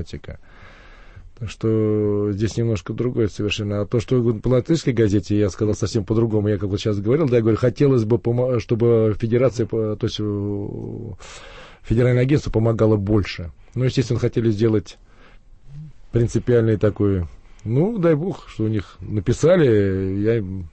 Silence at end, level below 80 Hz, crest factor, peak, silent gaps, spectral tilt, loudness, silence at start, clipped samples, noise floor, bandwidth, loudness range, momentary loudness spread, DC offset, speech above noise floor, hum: 0.05 s; -40 dBFS; 14 dB; -6 dBFS; none; -7.5 dB/octave; -20 LUFS; 0 s; under 0.1%; -45 dBFS; 8.6 kHz; 4 LU; 13 LU; under 0.1%; 26 dB; none